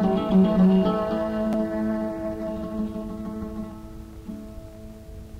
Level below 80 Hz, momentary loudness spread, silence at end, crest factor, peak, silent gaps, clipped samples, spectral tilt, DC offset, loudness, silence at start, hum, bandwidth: -44 dBFS; 23 LU; 0 s; 16 dB; -10 dBFS; none; under 0.1%; -9 dB/octave; under 0.1%; -24 LUFS; 0 s; none; 6.6 kHz